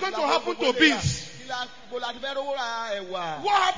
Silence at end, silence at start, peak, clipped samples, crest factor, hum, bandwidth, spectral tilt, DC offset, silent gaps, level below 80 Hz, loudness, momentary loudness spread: 0 s; 0 s; -6 dBFS; under 0.1%; 20 dB; none; 7.6 kHz; -3.5 dB/octave; 0.5%; none; -52 dBFS; -26 LUFS; 14 LU